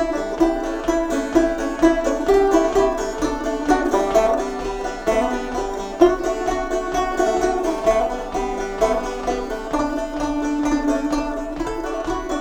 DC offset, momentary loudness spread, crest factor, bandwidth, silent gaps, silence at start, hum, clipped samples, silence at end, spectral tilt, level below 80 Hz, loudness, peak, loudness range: under 0.1%; 8 LU; 20 dB; 19 kHz; none; 0 s; none; under 0.1%; 0 s; -4.5 dB/octave; -36 dBFS; -21 LUFS; 0 dBFS; 4 LU